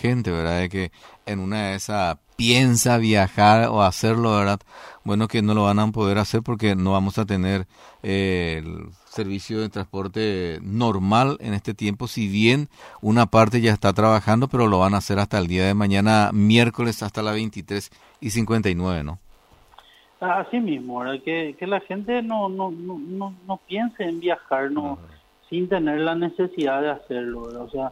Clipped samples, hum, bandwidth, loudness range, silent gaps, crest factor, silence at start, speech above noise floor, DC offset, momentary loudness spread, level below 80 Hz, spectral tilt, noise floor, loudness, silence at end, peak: under 0.1%; none; 15.5 kHz; 8 LU; none; 18 dB; 0 s; 31 dB; under 0.1%; 14 LU; -48 dBFS; -5.5 dB/octave; -52 dBFS; -22 LUFS; 0 s; -4 dBFS